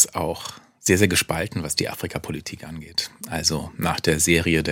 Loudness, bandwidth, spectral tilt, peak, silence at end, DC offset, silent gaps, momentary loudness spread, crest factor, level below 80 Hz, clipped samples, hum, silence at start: -22 LUFS; 17 kHz; -3.5 dB/octave; -2 dBFS; 0 s; under 0.1%; none; 14 LU; 22 dB; -48 dBFS; under 0.1%; none; 0 s